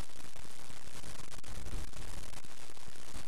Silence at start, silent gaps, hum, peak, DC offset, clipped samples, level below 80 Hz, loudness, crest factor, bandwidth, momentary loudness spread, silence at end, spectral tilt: 0 s; none; none; -22 dBFS; 4%; under 0.1%; -50 dBFS; -49 LUFS; 18 dB; 14 kHz; 5 LU; 0 s; -3.5 dB/octave